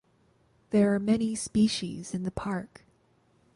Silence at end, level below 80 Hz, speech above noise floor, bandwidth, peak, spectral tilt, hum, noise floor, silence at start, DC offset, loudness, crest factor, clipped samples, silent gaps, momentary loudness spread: 0.9 s; -56 dBFS; 39 dB; 11.5 kHz; -12 dBFS; -5.5 dB/octave; none; -66 dBFS; 0.7 s; under 0.1%; -28 LUFS; 18 dB; under 0.1%; none; 10 LU